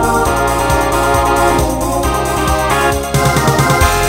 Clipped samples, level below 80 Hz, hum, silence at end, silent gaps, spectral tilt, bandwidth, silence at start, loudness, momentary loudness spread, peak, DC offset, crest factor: under 0.1%; -22 dBFS; none; 0 s; none; -4.5 dB/octave; 16.5 kHz; 0 s; -13 LUFS; 4 LU; 0 dBFS; under 0.1%; 12 dB